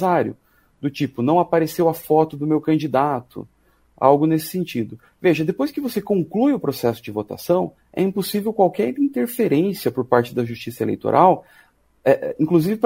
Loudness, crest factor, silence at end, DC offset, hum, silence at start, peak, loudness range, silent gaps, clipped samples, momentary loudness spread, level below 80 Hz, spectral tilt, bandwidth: -20 LUFS; 20 dB; 0 s; under 0.1%; none; 0 s; 0 dBFS; 2 LU; none; under 0.1%; 11 LU; -60 dBFS; -7 dB/octave; 16 kHz